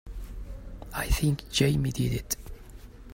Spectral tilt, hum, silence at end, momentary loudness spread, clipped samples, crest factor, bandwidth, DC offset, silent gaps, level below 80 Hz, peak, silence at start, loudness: -5 dB/octave; none; 0 s; 22 LU; under 0.1%; 20 dB; 16.5 kHz; under 0.1%; none; -38 dBFS; -10 dBFS; 0.05 s; -28 LUFS